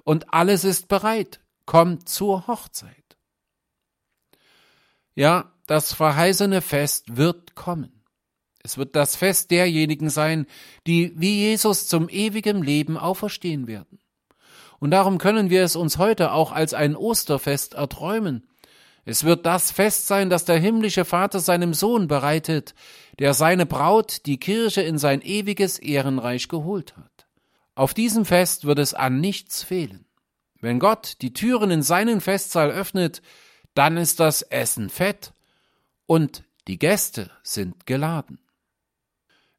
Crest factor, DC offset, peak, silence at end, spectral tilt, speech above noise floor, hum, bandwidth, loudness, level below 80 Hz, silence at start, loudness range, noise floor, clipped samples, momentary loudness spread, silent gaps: 20 dB; under 0.1%; -2 dBFS; 1.2 s; -4.5 dB/octave; 60 dB; none; 16.5 kHz; -21 LUFS; -56 dBFS; 0.05 s; 5 LU; -81 dBFS; under 0.1%; 11 LU; none